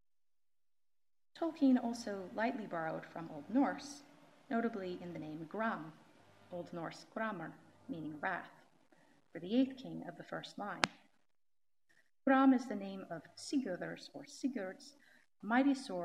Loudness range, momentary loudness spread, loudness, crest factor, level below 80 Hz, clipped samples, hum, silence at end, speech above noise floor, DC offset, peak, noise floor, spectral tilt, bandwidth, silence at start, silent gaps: 7 LU; 18 LU; -38 LUFS; 36 dB; -88 dBFS; under 0.1%; none; 0 s; over 52 dB; under 0.1%; -4 dBFS; under -90 dBFS; -5 dB/octave; 11.5 kHz; 1.35 s; none